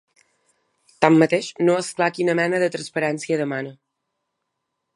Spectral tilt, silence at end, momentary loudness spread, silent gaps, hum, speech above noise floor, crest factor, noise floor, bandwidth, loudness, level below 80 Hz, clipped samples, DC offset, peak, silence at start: -5.5 dB/octave; 1.25 s; 8 LU; none; none; 58 dB; 22 dB; -78 dBFS; 11.5 kHz; -21 LUFS; -70 dBFS; under 0.1%; under 0.1%; 0 dBFS; 1 s